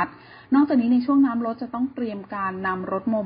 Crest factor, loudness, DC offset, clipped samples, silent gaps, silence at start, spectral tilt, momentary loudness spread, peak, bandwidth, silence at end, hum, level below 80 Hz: 14 dB; -23 LUFS; under 0.1%; under 0.1%; none; 0 s; -11.5 dB/octave; 10 LU; -8 dBFS; 5.2 kHz; 0 s; none; -60 dBFS